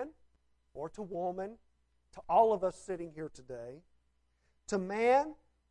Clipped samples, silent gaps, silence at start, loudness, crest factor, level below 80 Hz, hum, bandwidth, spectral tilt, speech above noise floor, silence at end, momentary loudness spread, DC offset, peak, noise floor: under 0.1%; none; 0 s; -33 LUFS; 20 dB; -66 dBFS; none; 11 kHz; -5.5 dB/octave; 41 dB; 0.35 s; 19 LU; under 0.1%; -14 dBFS; -74 dBFS